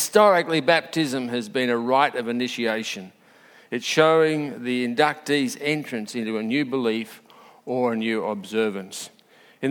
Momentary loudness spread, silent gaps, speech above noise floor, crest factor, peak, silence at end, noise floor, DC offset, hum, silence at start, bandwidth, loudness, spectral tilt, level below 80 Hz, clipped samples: 13 LU; none; 30 dB; 22 dB; -2 dBFS; 0 s; -52 dBFS; under 0.1%; none; 0 s; 19 kHz; -23 LUFS; -4 dB/octave; -76 dBFS; under 0.1%